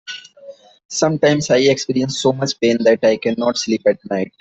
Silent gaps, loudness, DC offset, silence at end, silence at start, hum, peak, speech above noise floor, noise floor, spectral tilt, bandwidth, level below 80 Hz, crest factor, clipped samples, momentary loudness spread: 0.85-0.89 s; -17 LUFS; under 0.1%; 0.1 s; 0.05 s; none; -2 dBFS; 24 dB; -41 dBFS; -4.5 dB/octave; 8.4 kHz; -58 dBFS; 16 dB; under 0.1%; 8 LU